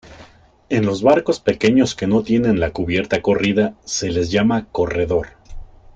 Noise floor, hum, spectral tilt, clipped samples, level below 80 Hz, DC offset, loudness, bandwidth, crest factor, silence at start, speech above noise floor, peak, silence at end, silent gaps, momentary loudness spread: -46 dBFS; none; -5.5 dB/octave; under 0.1%; -40 dBFS; under 0.1%; -18 LUFS; 9 kHz; 16 dB; 0.05 s; 29 dB; -2 dBFS; 0.3 s; none; 6 LU